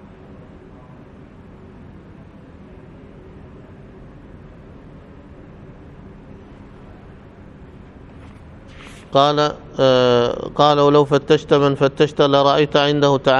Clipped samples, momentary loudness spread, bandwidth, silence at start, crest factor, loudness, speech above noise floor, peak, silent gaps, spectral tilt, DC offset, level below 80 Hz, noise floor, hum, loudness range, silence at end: under 0.1%; 7 LU; 8 kHz; 4.45 s; 20 dB; -15 LUFS; 26 dB; 0 dBFS; none; -6 dB/octave; under 0.1%; -46 dBFS; -41 dBFS; none; 10 LU; 0 s